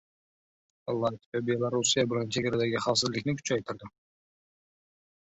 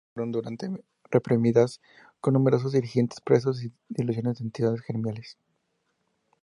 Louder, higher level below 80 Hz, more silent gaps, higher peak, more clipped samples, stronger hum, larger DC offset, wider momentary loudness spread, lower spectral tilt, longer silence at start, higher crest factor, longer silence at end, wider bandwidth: second, -29 LUFS vs -26 LUFS; about the same, -66 dBFS vs -66 dBFS; first, 1.26-1.32 s vs none; second, -12 dBFS vs -6 dBFS; neither; neither; neither; second, 9 LU vs 13 LU; second, -4 dB/octave vs -8 dB/octave; first, 0.85 s vs 0.15 s; about the same, 20 dB vs 20 dB; first, 1.5 s vs 1.1 s; second, 8.4 kHz vs 11 kHz